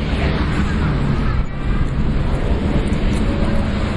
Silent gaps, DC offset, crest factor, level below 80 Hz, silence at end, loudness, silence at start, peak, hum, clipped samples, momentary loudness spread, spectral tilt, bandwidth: none; under 0.1%; 12 dB; -20 dBFS; 0 s; -20 LUFS; 0 s; -4 dBFS; none; under 0.1%; 3 LU; -7.5 dB/octave; 11.5 kHz